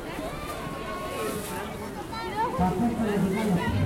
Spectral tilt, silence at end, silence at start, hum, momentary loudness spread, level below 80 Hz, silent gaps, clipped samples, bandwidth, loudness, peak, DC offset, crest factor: -6 dB/octave; 0 s; 0 s; none; 9 LU; -44 dBFS; none; under 0.1%; 16.5 kHz; -29 LUFS; -12 dBFS; under 0.1%; 16 dB